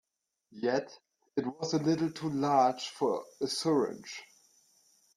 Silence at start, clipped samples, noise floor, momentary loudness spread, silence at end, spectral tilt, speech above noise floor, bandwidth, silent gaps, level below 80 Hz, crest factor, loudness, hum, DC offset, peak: 0.55 s; under 0.1%; -71 dBFS; 13 LU; 0.9 s; -5 dB/octave; 40 dB; 13.5 kHz; none; -76 dBFS; 20 dB; -31 LUFS; none; under 0.1%; -14 dBFS